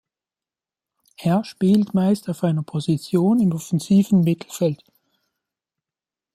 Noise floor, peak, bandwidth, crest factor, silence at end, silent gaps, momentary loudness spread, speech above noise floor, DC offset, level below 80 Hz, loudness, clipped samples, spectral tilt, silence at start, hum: under -90 dBFS; -6 dBFS; 14.5 kHz; 14 dB; 1.6 s; none; 7 LU; over 71 dB; under 0.1%; -62 dBFS; -20 LUFS; under 0.1%; -7.5 dB/octave; 1.2 s; none